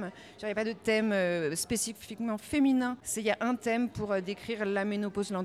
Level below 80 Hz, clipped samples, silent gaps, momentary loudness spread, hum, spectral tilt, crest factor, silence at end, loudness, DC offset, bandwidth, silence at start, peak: -62 dBFS; under 0.1%; none; 8 LU; none; -4 dB/octave; 16 dB; 0 s; -31 LUFS; under 0.1%; 15.5 kHz; 0 s; -16 dBFS